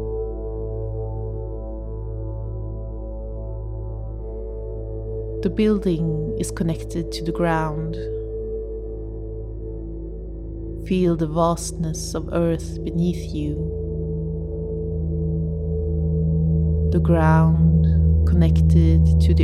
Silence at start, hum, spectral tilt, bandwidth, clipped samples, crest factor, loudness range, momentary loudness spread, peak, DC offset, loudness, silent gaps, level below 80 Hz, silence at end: 0 s; none; -7.5 dB/octave; 12 kHz; under 0.1%; 16 dB; 13 LU; 16 LU; -4 dBFS; under 0.1%; -23 LUFS; none; -26 dBFS; 0 s